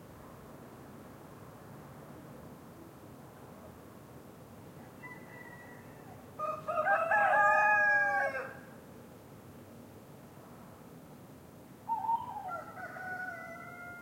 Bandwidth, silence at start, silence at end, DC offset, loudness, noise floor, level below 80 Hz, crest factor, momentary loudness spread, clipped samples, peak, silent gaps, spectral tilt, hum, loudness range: 16.5 kHz; 0 s; 0 s; under 0.1%; -31 LUFS; -53 dBFS; -72 dBFS; 20 dB; 26 LU; under 0.1%; -16 dBFS; none; -5 dB/octave; none; 22 LU